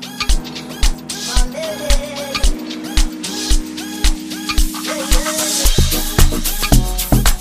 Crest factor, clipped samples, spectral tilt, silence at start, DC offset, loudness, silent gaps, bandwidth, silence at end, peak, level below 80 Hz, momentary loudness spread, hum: 16 dB; under 0.1%; -3.5 dB/octave; 0 s; 0.7%; -18 LUFS; none; 15.5 kHz; 0 s; 0 dBFS; -18 dBFS; 7 LU; none